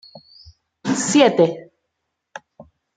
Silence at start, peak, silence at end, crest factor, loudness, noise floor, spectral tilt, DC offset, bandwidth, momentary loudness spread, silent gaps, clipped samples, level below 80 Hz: 0.15 s; -2 dBFS; 0.35 s; 20 dB; -17 LUFS; -77 dBFS; -4 dB/octave; under 0.1%; 9.6 kHz; 26 LU; none; under 0.1%; -62 dBFS